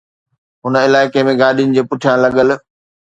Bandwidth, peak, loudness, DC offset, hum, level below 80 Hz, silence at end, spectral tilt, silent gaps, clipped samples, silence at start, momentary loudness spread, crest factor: 8 kHz; 0 dBFS; -13 LUFS; under 0.1%; none; -54 dBFS; 0.5 s; -6 dB/octave; none; under 0.1%; 0.65 s; 6 LU; 14 dB